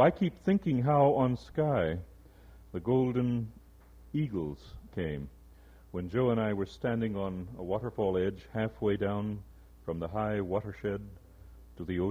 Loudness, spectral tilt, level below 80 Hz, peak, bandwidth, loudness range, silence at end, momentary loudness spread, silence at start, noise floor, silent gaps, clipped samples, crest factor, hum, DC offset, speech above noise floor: -32 LUFS; -9 dB/octave; -54 dBFS; -12 dBFS; 15.5 kHz; 6 LU; 0 s; 15 LU; 0 s; -55 dBFS; none; under 0.1%; 20 dB; none; under 0.1%; 24 dB